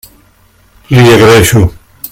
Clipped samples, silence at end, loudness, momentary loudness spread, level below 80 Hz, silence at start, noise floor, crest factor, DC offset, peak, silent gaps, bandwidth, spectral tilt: 3%; 0.05 s; -6 LUFS; 11 LU; -30 dBFS; 0.9 s; -46 dBFS; 8 dB; under 0.1%; 0 dBFS; none; 17 kHz; -5.5 dB/octave